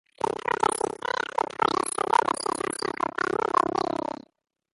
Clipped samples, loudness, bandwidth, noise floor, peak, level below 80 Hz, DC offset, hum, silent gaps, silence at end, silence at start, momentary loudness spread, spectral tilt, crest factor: under 0.1%; -27 LUFS; 12 kHz; -62 dBFS; -6 dBFS; -62 dBFS; under 0.1%; none; none; 0.7 s; 0.25 s; 6 LU; -3 dB/octave; 20 dB